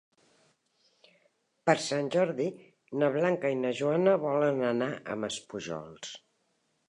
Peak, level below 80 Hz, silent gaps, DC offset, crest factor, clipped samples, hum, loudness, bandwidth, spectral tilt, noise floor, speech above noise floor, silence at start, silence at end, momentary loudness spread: -8 dBFS; -76 dBFS; none; under 0.1%; 22 dB; under 0.1%; none; -30 LUFS; 11.5 kHz; -5 dB/octave; -75 dBFS; 46 dB; 1.65 s; 0.75 s; 13 LU